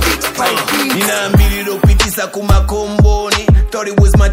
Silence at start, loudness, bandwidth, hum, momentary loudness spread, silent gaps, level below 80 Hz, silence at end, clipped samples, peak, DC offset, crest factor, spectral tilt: 0 s; -13 LUFS; 16.5 kHz; none; 4 LU; none; -14 dBFS; 0 s; 0.2%; 0 dBFS; under 0.1%; 12 dB; -4.5 dB/octave